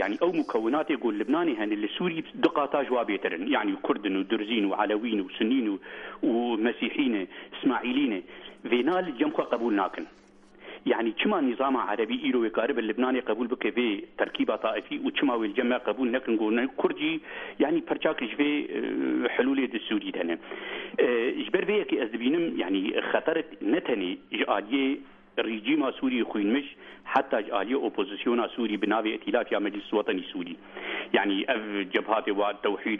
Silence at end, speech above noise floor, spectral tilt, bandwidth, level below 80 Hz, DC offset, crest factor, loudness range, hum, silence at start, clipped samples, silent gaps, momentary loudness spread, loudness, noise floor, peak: 0 s; 22 dB; -7 dB/octave; 5.6 kHz; -66 dBFS; under 0.1%; 18 dB; 1 LU; none; 0 s; under 0.1%; none; 6 LU; -28 LUFS; -49 dBFS; -8 dBFS